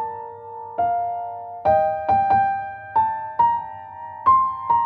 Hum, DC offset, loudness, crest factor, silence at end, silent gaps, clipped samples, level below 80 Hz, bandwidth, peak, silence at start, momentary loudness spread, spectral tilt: none; under 0.1%; -21 LUFS; 16 dB; 0 s; none; under 0.1%; -52 dBFS; 5.2 kHz; -6 dBFS; 0 s; 17 LU; -8 dB/octave